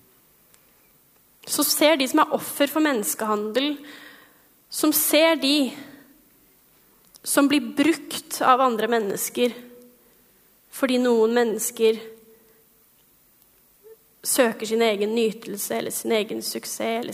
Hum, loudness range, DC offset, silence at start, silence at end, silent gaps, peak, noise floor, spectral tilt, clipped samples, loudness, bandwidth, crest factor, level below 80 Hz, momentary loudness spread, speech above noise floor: none; 3 LU; under 0.1%; 1.45 s; 0 s; none; -4 dBFS; -59 dBFS; -2.5 dB/octave; under 0.1%; -22 LUFS; 16 kHz; 20 dB; -74 dBFS; 13 LU; 37 dB